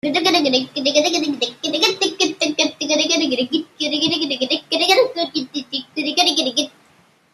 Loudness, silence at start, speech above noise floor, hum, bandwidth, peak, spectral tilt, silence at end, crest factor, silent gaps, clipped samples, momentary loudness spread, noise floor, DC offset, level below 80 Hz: -18 LUFS; 0.05 s; 38 dB; none; 14.5 kHz; -2 dBFS; -1.5 dB/octave; 0.65 s; 18 dB; none; under 0.1%; 8 LU; -55 dBFS; under 0.1%; -68 dBFS